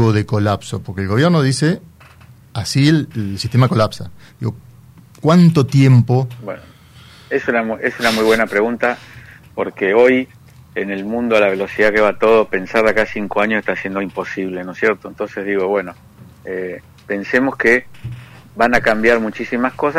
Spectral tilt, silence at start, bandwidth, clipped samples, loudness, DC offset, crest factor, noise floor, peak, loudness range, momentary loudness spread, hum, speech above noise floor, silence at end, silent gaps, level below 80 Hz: -6.5 dB/octave; 0 s; 15 kHz; under 0.1%; -16 LUFS; under 0.1%; 14 dB; -43 dBFS; -2 dBFS; 4 LU; 16 LU; none; 28 dB; 0 s; none; -48 dBFS